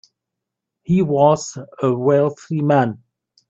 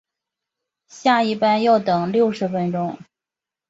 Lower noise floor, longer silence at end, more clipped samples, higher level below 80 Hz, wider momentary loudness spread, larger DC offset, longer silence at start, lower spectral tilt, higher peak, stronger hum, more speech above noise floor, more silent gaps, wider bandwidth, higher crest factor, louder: second, -82 dBFS vs -88 dBFS; second, 0.55 s vs 0.75 s; neither; first, -56 dBFS vs -64 dBFS; first, 13 LU vs 9 LU; neither; about the same, 0.9 s vs 0.95 s; about the same, -7 dB/octave vs -6 dB/octave; about the same, -2 dBFS vs -2 dBFS; neither; second, 65 dB vs 69 dB; neither; about the same, 8 kHz vs 7.8 kHz; about the same, 18 dB vs 18 dB; about the same, -18 LUFS vs -19 LUFS